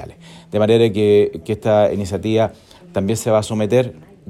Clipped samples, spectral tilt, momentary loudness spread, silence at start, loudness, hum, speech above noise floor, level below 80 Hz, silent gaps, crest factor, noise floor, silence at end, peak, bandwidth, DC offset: under 0.1%; -6.5 dB/octave; 10 LU; 0 s; -17 LUFS; none; 21 dB; -52 dBFS; none; 16 dB; -37 dBFS; 0.3 s; -2 dBFS; 13.5 kHz; under 0.1%